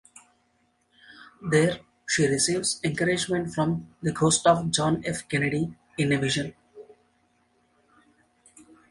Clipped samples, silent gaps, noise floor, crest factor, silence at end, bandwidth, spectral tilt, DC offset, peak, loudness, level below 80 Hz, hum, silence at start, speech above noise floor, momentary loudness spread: under 0.1%; none; -69 dBFS; 22 dB; 2.1 s; 11.5 kHz; -4 dB/octave; under 0.1%; -6 dBFS; -25 LUFS; -58 dBFS; none; 1.1 s; 44 dB; 9 LU